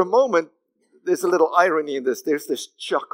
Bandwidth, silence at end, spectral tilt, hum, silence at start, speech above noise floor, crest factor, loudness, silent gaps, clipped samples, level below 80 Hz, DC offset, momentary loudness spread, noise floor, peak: 16 kHz; 0.1 s; -4 dB/octave; none; 0 s; 41 dB; 18 dB; -21 LUFS; none; under 0.1%; under -90 dBFS; under 0.1%; 11 LU; -61 dBFS; -2 dBFS